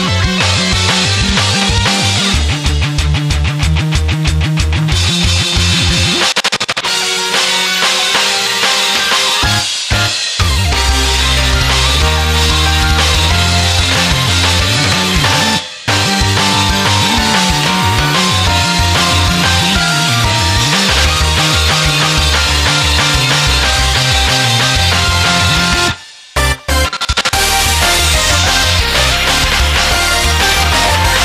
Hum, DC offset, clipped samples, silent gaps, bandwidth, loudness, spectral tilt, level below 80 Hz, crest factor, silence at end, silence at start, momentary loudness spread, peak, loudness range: none; under 0.1%; under 0.1%; none; 15.5 kHz; -10 LUFS; -3 dB/octave; -20 dBFS; 12 dB; 0 s; 0 s; 4 LU; 0 dBFS; 2 LU